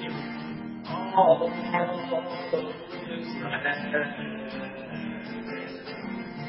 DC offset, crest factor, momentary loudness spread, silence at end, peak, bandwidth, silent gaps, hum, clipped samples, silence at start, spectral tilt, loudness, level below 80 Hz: under 0.1%; 22 dB; 14 LU; 0 s; -8 dBFS; 5.8 kHz; none; none; under 0.1%; 0 s; -9.5 dB/octave; -29 LUFS; -64 dBFS